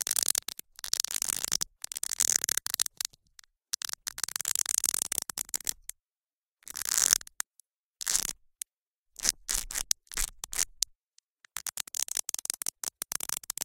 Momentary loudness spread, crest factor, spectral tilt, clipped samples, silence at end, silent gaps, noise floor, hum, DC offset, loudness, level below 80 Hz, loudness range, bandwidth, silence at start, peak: 13 LU; 34 dB; 2 dB/octave; under 0.1%; 0 s; 6.33-6.42 s, 6.51-6.55 s, 7.47-7.51 s, 7.78-7.94 s, 8.82-8.91 s, 8.98-9.06 s, 11.03-11.07 s, 11.30-11.35 s; under -90 dBFS; none; under 0.1%; -30 LUFS; -54 dBFS; 3 LU; 17 kHz; 0 s; 0 dBFS